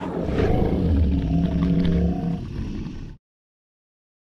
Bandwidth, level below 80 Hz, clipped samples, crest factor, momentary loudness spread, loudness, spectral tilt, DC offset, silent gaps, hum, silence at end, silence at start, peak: 6.4 kHz; -30 dBFS; under 0.1%; 16 dB; 12 LU; -23 LUFS; -9.5 dB/octave; under 0.1%; none; none; 1.1 s; 0 s; -8 dBFS